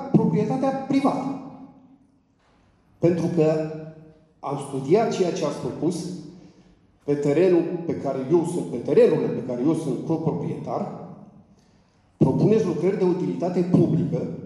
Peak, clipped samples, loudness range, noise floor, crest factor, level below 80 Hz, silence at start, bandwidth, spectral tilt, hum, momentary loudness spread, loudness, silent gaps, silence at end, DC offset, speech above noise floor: -6 dBFS; under 0.1%; 5 LU; -61 dBFS; 18 dB; -64 dBFS; 0 s; 11.5 kHz; -8 dB/octave; none; 13 LU; -23 LUFS; none; 0 s; under 0.1%; 39 dB